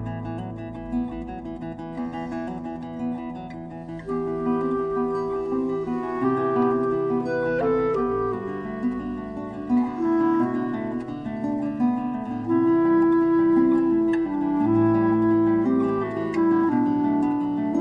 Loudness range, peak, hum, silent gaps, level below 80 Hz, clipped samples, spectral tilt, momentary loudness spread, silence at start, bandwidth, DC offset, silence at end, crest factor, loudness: 10 LU; -10 dBFS; none; none; -50 dBFS; under 0.1%; -9.5 dB/octave; 13 LU; 0 s; 5.2 kHz; under 0.1%; 0 s; 14 dB; -24 LUFS